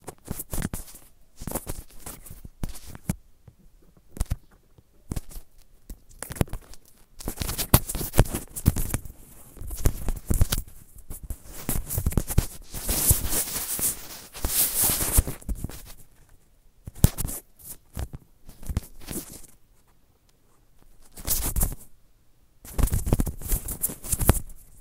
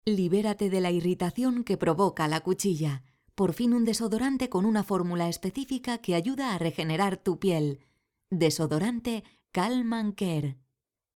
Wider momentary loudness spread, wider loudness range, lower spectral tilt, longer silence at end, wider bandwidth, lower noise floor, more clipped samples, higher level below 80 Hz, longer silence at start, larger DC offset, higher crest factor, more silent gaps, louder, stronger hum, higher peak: first, 22 LU vs 7 LU; first, 15 LU vs 2 LU; second, -4 dB/octave vs -6 dB/octave; second, 0 s vs 0.65 s; about the same, 16.5 kHz vs 18 kHz; second, -60 dBFS vs -83 dBFS; neither; first, -34 dBFS vs -60 dBFS; about the same, 0.05 s vs 0.05 s; neither; first, 28 dB vs 16 dB; neither; about the same, -27 LUFS vs -28 LUFS; neither; first, 0 dBFS vs -12 dBFS